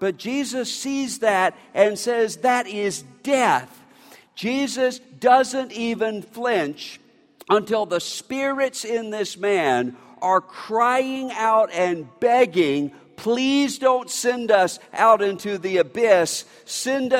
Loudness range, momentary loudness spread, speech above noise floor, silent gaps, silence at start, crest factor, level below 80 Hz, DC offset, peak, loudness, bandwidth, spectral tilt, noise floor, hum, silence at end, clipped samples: 4 LU; 10 LU; 29 dB; none; 0 s; 18 dB; -70 dBFS; under 0.1%; -4 dBFS; -21 LUFS; 16.5 kHz; -3.5 dB/octave; -50 dBFS; none; 0 s; under 0.1%